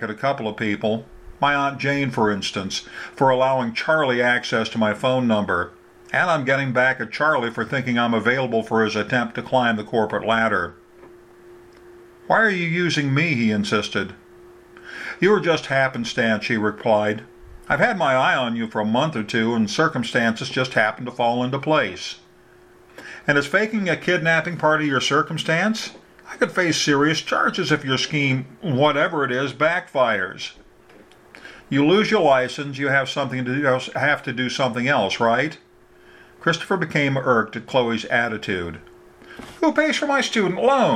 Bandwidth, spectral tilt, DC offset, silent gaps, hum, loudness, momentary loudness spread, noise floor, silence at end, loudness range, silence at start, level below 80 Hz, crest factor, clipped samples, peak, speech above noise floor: 13.5 kHz; -5 dB/octave; under 0.1%; none; none; -20 LUFS; 8 LU; -51 dBFS; 0 s; 2 LU; 0 s; -56 dBFS; 18 dB; under 0.1%; -2 dBFS; 30 dB